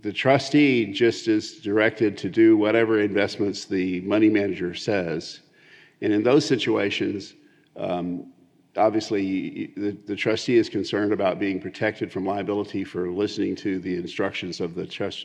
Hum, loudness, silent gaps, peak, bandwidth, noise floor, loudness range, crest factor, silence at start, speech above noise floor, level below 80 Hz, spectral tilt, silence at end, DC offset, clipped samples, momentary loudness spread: none; -23 LUFS; none; -4 dBFS; 9 kHz; -53 dBFS; 6 LU; 20 dB; 0.05 s; 30 dB; -72 dBFS; -5.5 dB/octave; 0 s; under 0.1%; under 0.1%; 11 LU